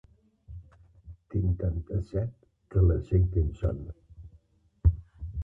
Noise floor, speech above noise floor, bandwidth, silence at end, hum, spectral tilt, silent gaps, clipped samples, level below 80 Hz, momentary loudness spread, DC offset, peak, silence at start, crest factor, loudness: -62 dBFS; 35 dB; 2.8 kHz; 0 s; none; -11.5 dB/octave; none; under 0.1%; -34 dBFS; 23 LU; under 0.1%; -10 dBFS; 0.5 s; 18 dB; -29 LUFS